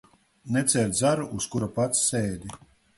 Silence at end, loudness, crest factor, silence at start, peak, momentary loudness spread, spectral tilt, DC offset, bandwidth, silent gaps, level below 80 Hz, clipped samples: 0.4 s; -25 LUFS; 20 dB; 0.45 s; -6 dBFS; 9 LU; -4 dB/octave; under 0.1%; 12 kHz; none; -54 dBFS; under 0.1%